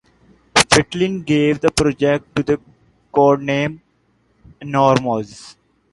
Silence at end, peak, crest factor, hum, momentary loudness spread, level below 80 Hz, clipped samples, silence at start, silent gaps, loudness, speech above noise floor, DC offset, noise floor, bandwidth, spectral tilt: 0.4 s; 0 dBFS; 18 dB; none; 9 LU; -44 dBFS; under 0.1%; 0.55 s; none; -17 LUFS; 44 dB; under 0.1%; -61 dBFS; 11.5 kHz; -4.5 dB/octave